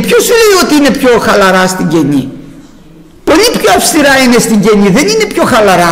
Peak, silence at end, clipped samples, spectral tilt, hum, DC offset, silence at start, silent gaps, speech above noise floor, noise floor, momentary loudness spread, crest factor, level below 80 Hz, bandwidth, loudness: 0 dBFS; 0 s; under 0.1%; -4 dB/octave; none; under 0.1%; 0 s; none; 28 dB; -34 dBFS; 5 LU; 8 dB; -34 dBFS; 16.5 kHz; -6 LUFS